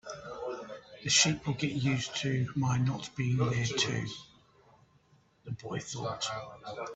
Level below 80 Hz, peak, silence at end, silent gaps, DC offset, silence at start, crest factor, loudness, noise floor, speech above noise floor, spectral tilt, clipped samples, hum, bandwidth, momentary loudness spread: -62 dBFS; -10 dBFS; 0 s; none; under 0.1%; 0.05 s; 24 dB; -31 LUFS; -66 dBFS; 34 dB; -4 dB/octave; under 0.1%; none; 8.4 kHz; 17 LU